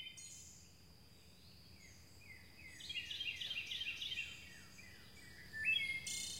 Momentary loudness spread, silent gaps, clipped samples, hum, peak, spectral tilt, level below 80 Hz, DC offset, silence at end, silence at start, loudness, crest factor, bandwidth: 24 LU; none; under 0.1%; none; -28 dBFS; 0 dB/octave; -70 dBFS; under 0.1%; 0 s; 0 s; -42 LUFS; 20 dB; 16 kHz